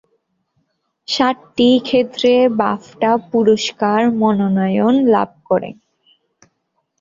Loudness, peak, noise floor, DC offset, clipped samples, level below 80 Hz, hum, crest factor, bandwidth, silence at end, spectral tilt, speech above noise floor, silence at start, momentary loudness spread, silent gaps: -15 LUFS; -2 dBFS; -69 dBFS; under 0.1%; under 0.1%; -58 dBFS; none; 14 dB; 7.6 kHz; 1.25 s; -6 dB/octave; 54 dB; 1.1 s; 7 LU; none